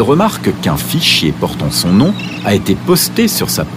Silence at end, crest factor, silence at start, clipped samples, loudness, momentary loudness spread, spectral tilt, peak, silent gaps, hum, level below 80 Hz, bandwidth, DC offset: 0 s; 12 dB; 0 s; under 0.1%; -12 LUFS; 6 LU; -4.5 dB/octave; 0 dBFS; none; none; -36 dBFS; 16 kHz; under 0.1%